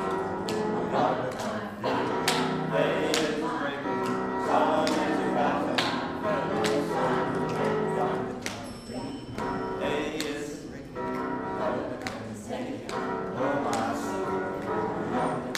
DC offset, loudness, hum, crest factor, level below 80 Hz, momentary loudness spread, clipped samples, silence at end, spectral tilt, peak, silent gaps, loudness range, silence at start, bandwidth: under 0.1%; -29 LUFS; none; 20 dB; -56 dBFS; 9 LU; under 0.1%; 0 s; -5 dB/octave; -8 dBFS; none; 6 LU; 0 s; 15.5 kHz